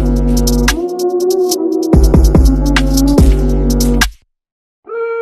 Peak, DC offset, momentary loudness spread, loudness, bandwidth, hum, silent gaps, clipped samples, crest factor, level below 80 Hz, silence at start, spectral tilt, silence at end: 0 dBFS; under 0.1%; 7 LU; -12 LUFS; 13.5 kHz; none; 4.52-4.83 s; under 0.1%; 10 dB; -14 dBFS; 0 s; -5.5 dB/octave; 0 s